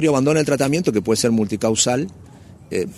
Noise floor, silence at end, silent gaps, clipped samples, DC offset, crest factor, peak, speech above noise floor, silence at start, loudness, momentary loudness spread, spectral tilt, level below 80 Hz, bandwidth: -42 dBFS; 0 s; none; under 0.1%; under 0.1%; 16 dB; -2 dBFS; 24 dB; 0 s; -19 LUFS; 8 LU; -4.5 dB/octave; -52 dBFS; 15 kHz